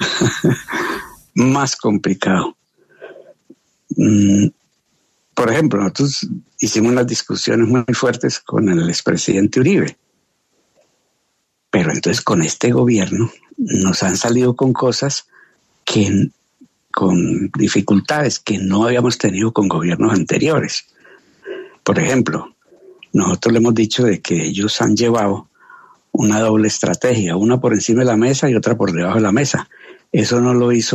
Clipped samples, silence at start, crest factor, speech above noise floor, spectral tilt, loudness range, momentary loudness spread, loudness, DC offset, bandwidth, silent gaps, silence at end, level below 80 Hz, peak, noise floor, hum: under 0.1%; 0 s; 14 dB; 53 dB; -5 dB/octave; 3 LU; 8 LU; -16 LUFS; under 0.1%; 13.5 kHz; none; 0 s; -54 dBFS; -2 dBFS; -68 dBFS; none